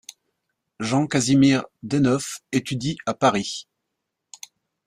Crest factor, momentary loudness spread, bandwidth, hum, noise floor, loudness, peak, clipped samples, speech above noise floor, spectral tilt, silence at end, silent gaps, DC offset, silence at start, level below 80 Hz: 18 dB; 16 LU; 14.5 kHz; none; -80 dBFS; -22 LUFS; -4 dBFS; under 0.1%; 59 dB; -5 dB/octave; 1.25 s; none; under 0.1%; 0.8 s; -58 dBFS